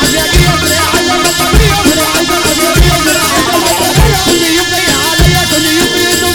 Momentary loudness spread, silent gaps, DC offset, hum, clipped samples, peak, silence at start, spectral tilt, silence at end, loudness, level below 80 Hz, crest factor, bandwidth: 1 LU; none; 0.3%; none; 0.2%; 0 dBFS; 0 s; -3 dB/octave; 0 s; -8 LUFS; -18 dBFS; 8 dB; 19.5 kHz